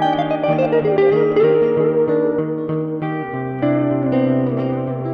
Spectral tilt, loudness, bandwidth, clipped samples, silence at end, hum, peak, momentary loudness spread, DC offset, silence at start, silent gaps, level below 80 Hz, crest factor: -9.5 dB/octave; -18 LUFS; 6 kHz; under 0.1%; 0 s; none; -4 dBFS; 8 LU; under 0.1%; 0 s; none; -54 dBFS; 12 dB